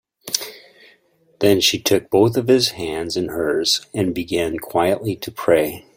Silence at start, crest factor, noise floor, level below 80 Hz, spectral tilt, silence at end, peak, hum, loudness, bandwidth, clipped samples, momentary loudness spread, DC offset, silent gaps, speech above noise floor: 0.25 s; 20 dB; -57 dBFS; -52 dBFS; -4 dB/octave; 0.15 s; 0 dBFS; none; -19 LUFS; 16.5 kHz; under 0.1%; 8 LU; under 0.1%; none; 38 dB